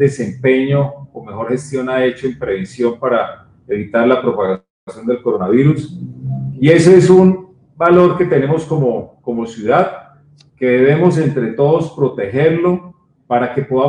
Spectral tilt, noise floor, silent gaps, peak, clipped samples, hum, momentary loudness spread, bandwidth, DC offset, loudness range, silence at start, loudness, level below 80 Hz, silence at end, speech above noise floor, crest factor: -7.5 dB/octave; -47 dBFS; 4.70-4.87 s; 0 dBFS; 0.1%; none; 14 LU; 10.5 kHz; under 0.1%; 6 LU; 0 s; -14 LUFS; -52 dBFS; 0 s; 34 dB; 14 dB